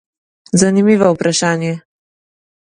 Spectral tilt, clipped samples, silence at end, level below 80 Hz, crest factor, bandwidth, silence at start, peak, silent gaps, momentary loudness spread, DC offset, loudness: -5 dB/octave; under 0.1%; 0.95 s; -54 dBFS; 16 dB; 11 kHz; 0.55 s; 0 dBFS; none; 10 LU; under 0.1%; -14 LUFS